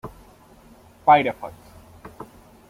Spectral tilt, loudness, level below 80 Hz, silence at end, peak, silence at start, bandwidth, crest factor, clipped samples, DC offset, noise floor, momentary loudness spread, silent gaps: -6 dB/octave; -19 LUFS; -54 dBFS; 0.45 s; -4 dBFS; 0.05 s; 15.5 kHz; 22 dB; under 0.1%; under 0.1%; -50 dBFS; 26 LU; none